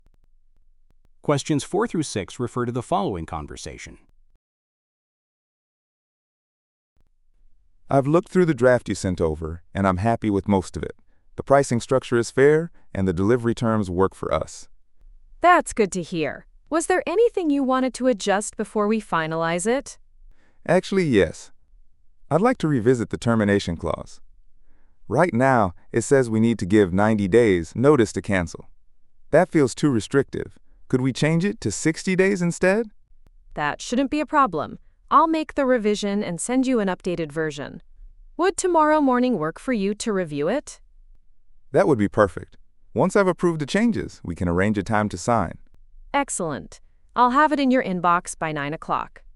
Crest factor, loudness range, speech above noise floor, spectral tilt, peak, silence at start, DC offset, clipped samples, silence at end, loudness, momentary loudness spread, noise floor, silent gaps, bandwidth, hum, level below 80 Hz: 20 dB; 4 LU; 34 dB; -6 dB/octave; -2 dBFS; 1.25 s; under 0.1%; under 0.1%; 0.3 s; -22 LUFS; 13 LU; -56 dBFS; 4.35-6.96 s; 11.5 kHz; none; -48 dBFS